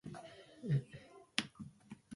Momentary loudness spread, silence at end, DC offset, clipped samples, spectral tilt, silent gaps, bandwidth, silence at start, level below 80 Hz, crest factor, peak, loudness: 18 LU; 0 s; under 0.1%; under 0.1%; -5 dB/octave; none; 11.5 kHz; 0.05 s; -72 dBFS; 32 dB; -12 dBFS; -41 LUFS